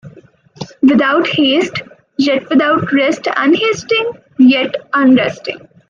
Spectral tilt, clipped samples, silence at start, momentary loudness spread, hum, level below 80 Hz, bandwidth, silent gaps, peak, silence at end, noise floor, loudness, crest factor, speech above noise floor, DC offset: -5 dB/octave; under 0.1%; 0.05 s; 15 LU; none; -58 dBFS; 7.4 kHz; none; 0 dBFS; 0.3 s; -42 dBFS; -13 LUFS; 12 dB; 30 dB; under 0.1%